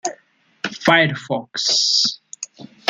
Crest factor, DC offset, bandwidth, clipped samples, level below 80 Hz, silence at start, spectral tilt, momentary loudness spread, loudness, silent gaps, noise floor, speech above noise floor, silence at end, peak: 20 dB; under 0.1%; 13 kHz; under 0.1%; -64 dBFS; 0.05 s; -2.5 dB/octave; 18 LU; -17 LUFS; none; -57 dBFS; 39 dB; 0.25 s; 0 dBFS